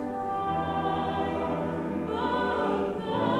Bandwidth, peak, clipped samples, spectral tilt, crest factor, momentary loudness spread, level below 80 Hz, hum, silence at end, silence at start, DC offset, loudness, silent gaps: 13 kHz; -16 dBFS; under 0.1%; -7.5 dB/octave; 14 dB; 4 LU; -52 dBFS; none; 0 s; 0 s; under 0.1%; -29 LUFS; none